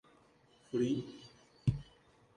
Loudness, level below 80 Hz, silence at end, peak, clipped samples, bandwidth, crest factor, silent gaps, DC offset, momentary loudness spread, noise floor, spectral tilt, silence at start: -37 LUFS; -56 dBFS; 0.55 s; -18 dBFS; under 0.1%; 10.5 kHz; 22 dB; none; under 0.1%; 19 LU; -67 dBFS; -8 dB/octave; 0.75 s